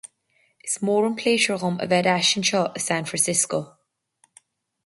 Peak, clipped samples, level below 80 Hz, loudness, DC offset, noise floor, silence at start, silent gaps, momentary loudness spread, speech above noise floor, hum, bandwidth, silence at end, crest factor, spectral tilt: -6 dBFS; under 0.1%; -68 dBFS; -22 LUFS; under 0.1%; -66 dBFS; 0.65 s; none; 9 LU; 44 dB; none; 12 kHz; 1.15 s; 18 dB; -3 dB/octave